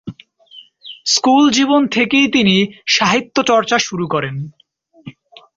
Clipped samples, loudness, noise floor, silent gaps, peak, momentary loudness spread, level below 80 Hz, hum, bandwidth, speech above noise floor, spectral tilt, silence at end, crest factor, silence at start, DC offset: under 0.1%; -14 LUFS; -43 dBFS; none; -2 dBFS; 17 LU; -56 dBFS; none; 7.8 kHz; 29 dB; -3.5 dB/octave; 0.45 s; 14 dB; 0.05 s; under 0.1%